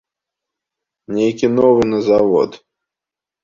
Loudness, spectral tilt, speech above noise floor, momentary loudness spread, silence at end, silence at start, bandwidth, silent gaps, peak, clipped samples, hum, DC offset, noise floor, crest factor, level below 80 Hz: -15 LUFS; -7 dB/octave; 73 dB; 8 LU; 0.85 s; 1.1 s; 7.4 kHz; none; -2 dBFS; under 0.1%; none; under 0.1%; -87 dBFS; 16 dB; -52 dBFS